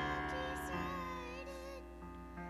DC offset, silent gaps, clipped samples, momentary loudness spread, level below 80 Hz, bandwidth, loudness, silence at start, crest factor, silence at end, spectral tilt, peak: under 0.1%; none; under 0.1%; 11 LU; -54 dBFS; 15 kHz; -43 LUFS; 0 s; 14 dB; 0 s; -5 dB/octave; -28 dBFS